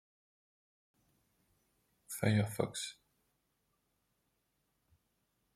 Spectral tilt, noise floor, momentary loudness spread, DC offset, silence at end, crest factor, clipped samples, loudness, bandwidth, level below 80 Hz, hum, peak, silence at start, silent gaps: -5.5 dB/octave; -81 dBFS; 12 LU; under 0.1%; 2.65 s; 26 dB; under 0.1%; -36 LUFS; 15 kHz; -74 dBFS; none; -16 dBFS; 2.1 s; none